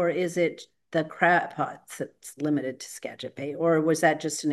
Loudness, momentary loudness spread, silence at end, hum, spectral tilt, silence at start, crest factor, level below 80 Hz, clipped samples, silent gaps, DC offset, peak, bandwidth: -26 LUFS; 15 LU; 0 s; none; -5 dB/octave; 0 s; 18 dB; -76 dBFS; under 0.1%; none; under 0.1%; -8 dBFS; 12.5 kHz